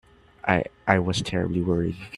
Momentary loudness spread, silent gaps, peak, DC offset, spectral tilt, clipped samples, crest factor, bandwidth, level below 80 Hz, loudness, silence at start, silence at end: 4 LU; none; -2 dBFS; under 0.1%; -6 dB/octave; under 0.1%; 24 dB; 11.5 kHz; -50 dBFS; -25 LUFS; 0.45 s; 0 s